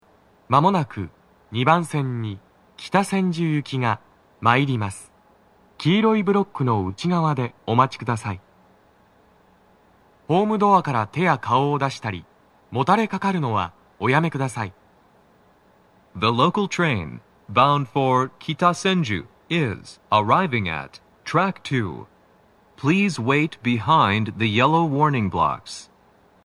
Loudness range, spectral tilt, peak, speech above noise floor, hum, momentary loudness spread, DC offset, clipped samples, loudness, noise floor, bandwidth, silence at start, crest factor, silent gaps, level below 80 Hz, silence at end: 4 LU; -6 dB/octave; -2 dBFS; 36 dB; none; 14 LU; under 0.1%; under 0.1%; -21 LUFS; -56 dBFS; 12 kHz; 0.5 s; 22 dB; none; -58 dBFS; 0.6 s